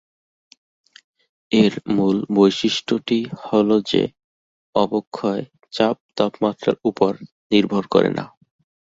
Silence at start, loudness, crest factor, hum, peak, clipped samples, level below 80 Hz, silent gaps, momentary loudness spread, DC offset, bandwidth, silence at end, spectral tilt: 1.5 s; -20 LUFS; 20 dB; none; -2 dBFS; under 0.1%; -60 dBFS; 4.24-4.73 s, 5.07-5.12 s, 6.00-6.09 s, 7.32-7.50 s; 8 LU; under 0.1%; 7.8 kHz; 0.65 s; -6 dB/octave